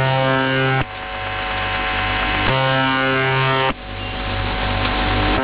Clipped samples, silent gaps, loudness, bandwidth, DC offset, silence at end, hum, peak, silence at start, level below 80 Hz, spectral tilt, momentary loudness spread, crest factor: under 0.1%; none; -19 LUFS; 4 kHz; under 0.1%; 0 s; none; -6 dBFS; 0 s; -30 dBFS; -9 dB/octave; 8 LU; 14 dB